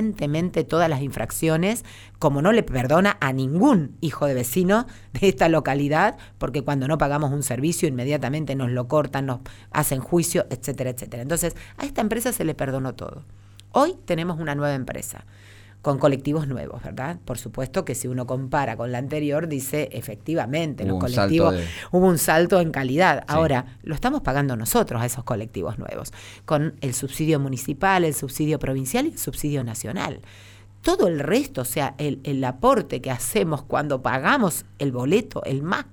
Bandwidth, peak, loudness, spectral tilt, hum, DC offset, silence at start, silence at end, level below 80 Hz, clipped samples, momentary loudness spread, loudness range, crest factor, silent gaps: over 20 kHz; -6 dBFS; -23 LUFS; -5.5 dB/octave; none; under 0.1%; 0 s; 0.05 s; -44 dBFS; under 0.1%; 11 LU; 6 LU; 18 dB; none